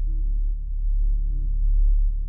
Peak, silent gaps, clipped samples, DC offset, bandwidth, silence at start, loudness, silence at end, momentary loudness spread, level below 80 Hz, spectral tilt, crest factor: -12 dBFS; none; under 0.1%; under 0.1%; 0.5 kHz; 0 s; -27 LUFS; 0 s; 6 LU; -20 dBFS; -14.5 dB/octave; 8 dB